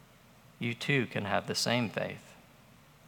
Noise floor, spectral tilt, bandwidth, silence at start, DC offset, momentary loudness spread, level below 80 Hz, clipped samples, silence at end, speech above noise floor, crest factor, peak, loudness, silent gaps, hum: -59 dBFS; -4.5 dB/octave; 18.5 kHz; 0.6 s; under 0.1%; 9 LU; -72 dBFS; under 0.1%; 0.65 s; 26 dB; 24 dB; -12 dBFS; -32 LUFS; none; none